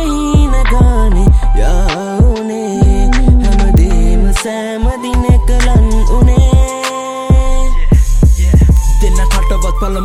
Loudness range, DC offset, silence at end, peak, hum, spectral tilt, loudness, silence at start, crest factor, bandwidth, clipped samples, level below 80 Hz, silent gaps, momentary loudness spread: 1 LU; under 0.1%; 0 s; 0 dBFS; none; -6.5 dB/octave; -12 LUFS; 0 s; 8 dB; 13 kHz; under 0.1%; -10 dBFS; none; 7 LU